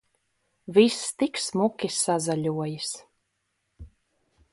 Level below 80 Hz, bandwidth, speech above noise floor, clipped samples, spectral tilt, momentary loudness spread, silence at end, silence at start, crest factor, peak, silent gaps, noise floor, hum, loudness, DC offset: -60 dBFS; 11.5 kHz; 52 dB; under 0.1%; -4 dB/octave; 12 LU; 0.65 s; 0.7 s; 22 dB; -6 dBFS; none; -77 dBFS; none; -25 LUFS; under 0.1%